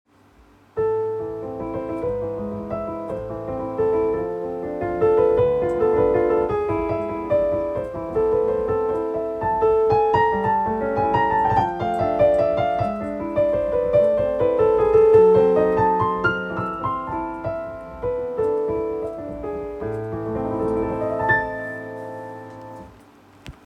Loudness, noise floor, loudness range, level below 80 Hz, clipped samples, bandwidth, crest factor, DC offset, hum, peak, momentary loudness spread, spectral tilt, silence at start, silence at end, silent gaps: -21 LUFS; -53 dBFS; 9 LU; -44 dBFS; under 0.1%; 6 kHz; 18 dB; under 0.1%; none; -4 dBFS; 12 LU; -8.5 dB/octave; 0.75 s; 0.15 s; none